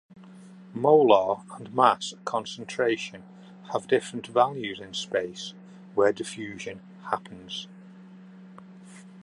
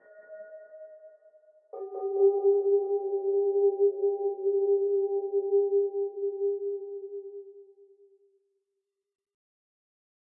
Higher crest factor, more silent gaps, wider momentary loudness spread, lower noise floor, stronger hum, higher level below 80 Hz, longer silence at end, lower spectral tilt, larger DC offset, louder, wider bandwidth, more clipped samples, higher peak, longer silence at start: first, 22 dB vs 16 dB; neither; second, 18 LU vs 22 LU; second, -48 dBFS vs -84 dBFS; neither; first, -70 dBFS vs under -90 dBFS; second, 0.05 s vs 2.7 s; second, -4.5 dB/octave vs -10 dB/octave; neither; about the same, -26 LUFS vs -27 LUFS; first, 11 kHz vs 2 kHz; neither; first, -4 dBFS vs -14 dBFS; about the same, 0.15 s vs 0.15 s